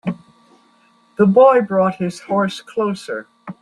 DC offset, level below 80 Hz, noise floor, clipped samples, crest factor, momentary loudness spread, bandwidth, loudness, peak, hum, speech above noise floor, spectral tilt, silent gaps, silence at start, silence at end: under 0.1%; -60 dBFS; -55 dBFS; under 0.1%; 16 dB; 20 LU; 11.5 kHz; -16 LUFS; -2 dBFS; none; 39 dB; -7 dB/octave; none; 0.05 s; 0.1 s